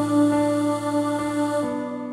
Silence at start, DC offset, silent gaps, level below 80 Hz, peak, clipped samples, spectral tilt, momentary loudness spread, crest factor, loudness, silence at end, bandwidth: 0 s; under 0.1%; none; -60 dBFS; -10 dBFS; under 0.1%; -6 dB/octave; 6 LU; 14 dB; -23 LUFS; 0 s; 14 kHz